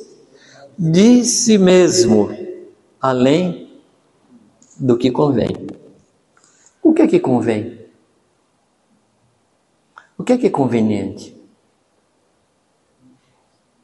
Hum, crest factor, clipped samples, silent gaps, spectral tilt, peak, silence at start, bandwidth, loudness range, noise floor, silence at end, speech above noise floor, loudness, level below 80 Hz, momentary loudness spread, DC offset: none; 18 dB; under 0.1%; none; -5 dB/octave; 0 dBFS; 0 s; 11.5 kHz; 9 LU; -62 dBFS; 2.55 s; 48 dB; -15 LUFS; -56 dBFS; 19 LU; under 0.1%